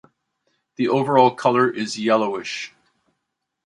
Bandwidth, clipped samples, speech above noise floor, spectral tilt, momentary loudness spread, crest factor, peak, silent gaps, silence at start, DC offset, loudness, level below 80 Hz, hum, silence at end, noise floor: 11 kHz; under 0.1%; 59 dB; -5 dB/octave; 13 LU; 20 dB; -2 dBFS; none; 0.8 s; under 0.1%; -20 LUFS; -68 dBFS; none; 1 s; -79 dBFS